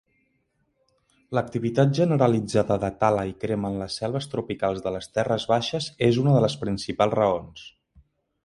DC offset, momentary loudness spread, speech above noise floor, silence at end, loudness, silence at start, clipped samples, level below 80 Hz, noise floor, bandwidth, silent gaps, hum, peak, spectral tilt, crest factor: under 0.1%; 9 LU; 48 dB; 0.75 s; -24 LUFS; 1.3 s; under 0.1%; -54 dBFS; -71 dBFS; 11.5 kHz; none; none; -4 dBFS; -6.5 dB/octave; 20 dB